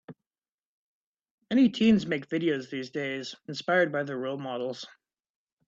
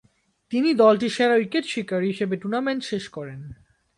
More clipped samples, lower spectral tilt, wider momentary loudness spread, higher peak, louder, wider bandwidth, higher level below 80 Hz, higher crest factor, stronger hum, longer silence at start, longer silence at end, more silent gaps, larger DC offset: neither; about the same, -6 dB/octave vs -5.5 dB/octave; second, 13 LU vs 18 LU; second, -10 dBFS vs -4 dBFS; second, -28 LUFS vs -22 LUFS; second, 7.6 kHz vs 11.5 kHz; second, -68 dBFS vs -62 dBFS; about the same, 18 dB vs 18 dB; neither; second, 0.1 s vs 0.5 s; first, 0.8 s vs 0.45 s; first, 0.54-1.14 s, 1.31-1.38 s vs none; neither